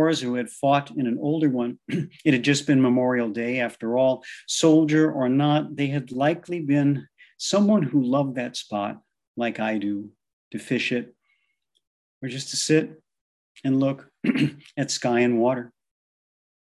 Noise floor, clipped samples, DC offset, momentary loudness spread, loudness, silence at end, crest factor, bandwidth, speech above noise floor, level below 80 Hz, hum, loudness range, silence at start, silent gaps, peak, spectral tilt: -73 dBFS; under 0.1%; under 0.1%; 11 LU; -23 LUFS; 1 s; 18 dB; 12 kHz; 50 dB; -70 dBFS; none; 7 LU; 0 s; 9.27-9.34 s, 10.33-10.51 s, 11.87-12.21 s, 13.21-13.55 s; -6 dBFS; -5.5 dB/octave